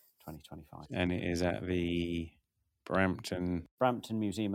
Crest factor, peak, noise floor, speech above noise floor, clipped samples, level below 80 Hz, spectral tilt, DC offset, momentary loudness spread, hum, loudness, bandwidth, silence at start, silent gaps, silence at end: 20 dB; -14 dBFS; -61 dBFS; 28 dB; under 0.1%; -56 dBFS; -6 dB/octave; under 0.1%; 18 LU; none; -34 LUFS; 16.5 kHz; 0.25 s; 3.71-3.78 s; 0 s